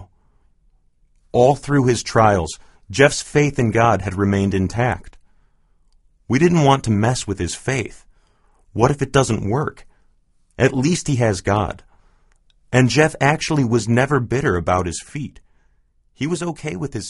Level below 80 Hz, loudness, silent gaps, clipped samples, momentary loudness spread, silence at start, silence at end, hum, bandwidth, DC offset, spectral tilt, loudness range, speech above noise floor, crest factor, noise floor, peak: -42 dBFS; -18 LUFS; none; under 0.1%; 12 LU; 0 s; 0 s; none; 11.5 kHz; under 0.1%; -5.5 dB/octave; 4 LU; 41 dB; 20 dB; -59 dBFS; 0 dBFS